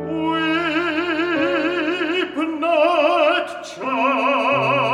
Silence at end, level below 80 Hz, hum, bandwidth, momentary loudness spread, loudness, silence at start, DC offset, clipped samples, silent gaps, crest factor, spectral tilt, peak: 0 s; -60 dBFS; none; 11.5 kHz; 6 LU; -19 LUFS; 0 s; under 0.1%; under 0.1%; none; 14 dB; -5 dB/octave; -4 dBFS